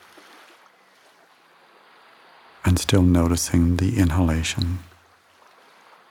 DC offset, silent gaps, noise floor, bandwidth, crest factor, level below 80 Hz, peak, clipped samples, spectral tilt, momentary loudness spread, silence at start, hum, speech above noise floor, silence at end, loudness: under 0.1%; none; -55 dBFS; 16.5 kHz; 22 dB; -36 dBFS; -2 dBFS; under 0.1%; -5.5 dB/octave; 9 LU; 2.65 s; none; 36 dB; 1.25 s; -21 LUFS